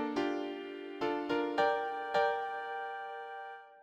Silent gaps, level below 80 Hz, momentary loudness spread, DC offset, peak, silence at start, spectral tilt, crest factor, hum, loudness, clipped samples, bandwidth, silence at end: none; -76 dBFS; 12 LU; under 0.1%; -18 dBFS; 0 s; -4.5 dB/octave; 18 dB; none; -35 LUFS; under 0.1%; 15 kHz; 0 s